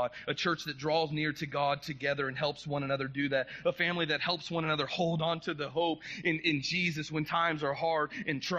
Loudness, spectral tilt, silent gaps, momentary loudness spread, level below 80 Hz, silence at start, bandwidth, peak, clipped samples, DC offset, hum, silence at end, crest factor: -32 LUFS; -5 dB/octave; none; 4 LU; -66 dBFS; 0 s; 13 kHz; -14 dBFS; under 0.1%; under 0.1%; none; 0 s; 18 dB